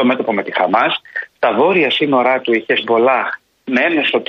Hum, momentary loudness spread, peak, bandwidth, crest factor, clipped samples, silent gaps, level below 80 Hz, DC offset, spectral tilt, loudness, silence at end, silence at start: none; 7 LU; -2 dBFS; 6.8 kHz; 14 dB; under 0.1%; none; -64 dBFS; under 0.1%; -6.5 dB/octave; -15 LUFS; 0.05 s; 0 s